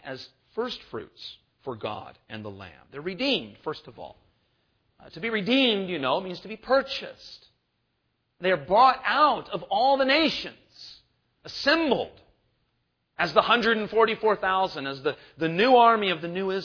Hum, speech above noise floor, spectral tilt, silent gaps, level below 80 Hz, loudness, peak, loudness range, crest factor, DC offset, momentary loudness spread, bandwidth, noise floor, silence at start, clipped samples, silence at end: none; 50 dB; -5.5 dB/octave; none; -62 dBFS; -24 LUFS; -2 dBFS; 10 LU; 24 dB; under 0.1%; 21 LU; 5.4 kHz; -75 dBFS; 0.05 s; under 0.1%; 0 s